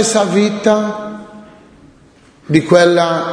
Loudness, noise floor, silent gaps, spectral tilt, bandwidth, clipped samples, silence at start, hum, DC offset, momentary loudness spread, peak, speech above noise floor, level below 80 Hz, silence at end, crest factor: -13 LUFS; -46 dBFS; none; -5 dB/octave; 10.5 kHz; under 0.1%; 0 s; none; under 0.1%; 17 LU; 0 dBFS; 34 dB; -56 dBFS; 0 s; 14 dB